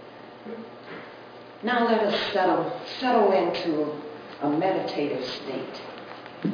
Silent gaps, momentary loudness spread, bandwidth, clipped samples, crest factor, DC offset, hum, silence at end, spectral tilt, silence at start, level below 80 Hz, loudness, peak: none; 19 LU; 5.4 kHz; under 0.1%; 18 dB; under 0.1%; none; 0 s; -6 dB/octave; 0 s; -70 dBFS; -25 LUFS; -8 dBFS